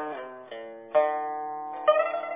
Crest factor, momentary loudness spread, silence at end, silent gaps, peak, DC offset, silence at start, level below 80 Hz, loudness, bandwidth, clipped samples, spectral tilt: 20 dB; 17 LU; 0 s; none; -8 dBFS; under 0.1%; 0 s; -86 dBFS; -27 LUFS; 3.8 kHz; under 0.1%; -6.5 dB/octave